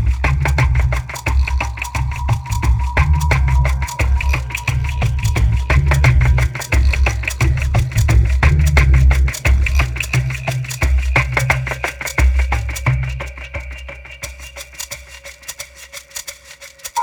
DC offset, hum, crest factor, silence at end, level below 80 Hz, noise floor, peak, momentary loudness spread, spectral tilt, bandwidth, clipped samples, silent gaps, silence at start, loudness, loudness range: under 0.1%; none; 16 dB; 0 s; -18 dBFS; -39 dBFS; 0 dBFS; 17 LU; -5 dB/octave; 18.5 kHz; under 0.1%; none; 0 s; -17 LUFS; 10 LU